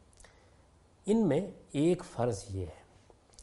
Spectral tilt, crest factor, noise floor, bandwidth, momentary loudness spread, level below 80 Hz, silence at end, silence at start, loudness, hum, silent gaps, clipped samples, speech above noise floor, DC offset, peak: -7 dB/octave; 18 dB; -63 dBFS; 11.5 kHz; 13 LU; -60 dBFS; 0 s; 1.05 s; -32 LUFS; none; none; under 0.1%; 32 dB; under 0.1%; -16 dBFS